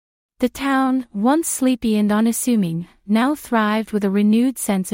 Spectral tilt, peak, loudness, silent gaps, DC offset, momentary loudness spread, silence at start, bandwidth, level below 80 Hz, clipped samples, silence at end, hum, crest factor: -5 dB/octave; -6 dBFS; -19 LUFS; none; under 0.1%; 5 LU; 0.4 s; 16.5 kHz; -52 dBFS; under 0.1%; 0 s; none; 14 dB